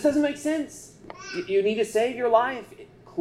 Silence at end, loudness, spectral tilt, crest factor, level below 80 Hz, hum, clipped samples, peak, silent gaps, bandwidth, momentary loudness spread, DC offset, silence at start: 0 s; -25 LUFS; -4.5 dB/octave; 18 dB; -62 dBFS; none; under 0.1%; -8 dBFS; none; 14 kHz; 20 LU; under 0.1%; 0 s